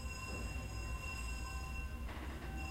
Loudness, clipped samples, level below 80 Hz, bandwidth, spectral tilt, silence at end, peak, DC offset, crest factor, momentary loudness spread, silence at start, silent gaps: -45 LUFS; under 0.1%; -46 dBFS; 16 kHz; -4.5 dB/octave; 0 s; -32 dBFS; under 0.1%; 12 dB; 3 LU; 0 s; none